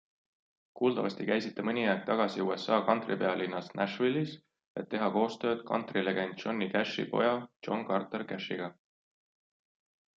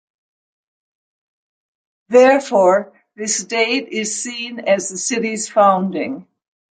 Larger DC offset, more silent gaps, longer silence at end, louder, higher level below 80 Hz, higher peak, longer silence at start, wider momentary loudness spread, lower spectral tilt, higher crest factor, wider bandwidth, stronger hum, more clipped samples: neither; first, 4.66-4.75 s, 7.56-7.60 s vs none; first, 1.45 s vs 0.5 s; second, -32 LUFS vs -17 LUFS; second, -78 dBFS vs -70 dBFS; second, -12 dBFS vs -2 dBFS; second, 0.75 s vs 2.1 s; second, 8 LU vs 12 LU; first, -6.5 dB/octave vs -3 dB/octave; first, 22 dB vs 16 dB; second, 7.8 kHz vs 9.6 kHz; neither; neither